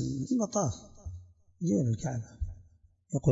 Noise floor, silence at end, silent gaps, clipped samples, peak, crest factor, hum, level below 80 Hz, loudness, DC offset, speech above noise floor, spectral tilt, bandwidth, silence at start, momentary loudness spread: -62 dBFS; 0 s; none; under 0.1%; -12 dBFS; 20 dB; none; -48 dBFS; -32 LUFS; under 0.1%; 31 dB; -7 dB/octave; 7.8 kHz; 0 s; 17 LU